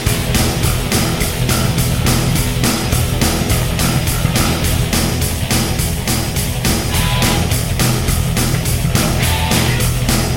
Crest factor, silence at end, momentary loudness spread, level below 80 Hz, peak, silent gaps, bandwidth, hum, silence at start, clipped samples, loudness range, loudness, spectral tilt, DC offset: 14 dB; 0 s; 3 LU; -22 dBFS; 0 dBFS; none; 17 kHz; none; 0 s; under 0.1%; 1 LU; -15 LUFS; -4 dB/octave; 1%